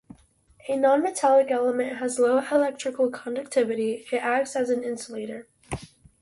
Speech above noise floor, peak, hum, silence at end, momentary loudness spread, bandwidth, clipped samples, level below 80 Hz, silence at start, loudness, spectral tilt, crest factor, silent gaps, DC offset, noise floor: 34 dB; -8 dBFS; none; 0.35 s; 17 LU; 11.5 kHz; under 0.1%; -58 dBFS; 0.65 s; -24 LUFS; -4 dB/octave; 16 dB; none; under 0.1%; -58 dBFS